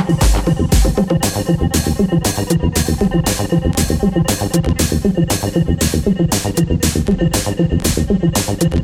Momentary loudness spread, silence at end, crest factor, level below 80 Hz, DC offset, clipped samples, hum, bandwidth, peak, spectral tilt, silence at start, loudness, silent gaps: 2 LU; 0 s; 12 dB; -22 dBFS; under 0.1%; under 0.1%; none; 17 kHz; -2 dBFS; -5.5 dB/octave; 0 s; -16 LUFS; none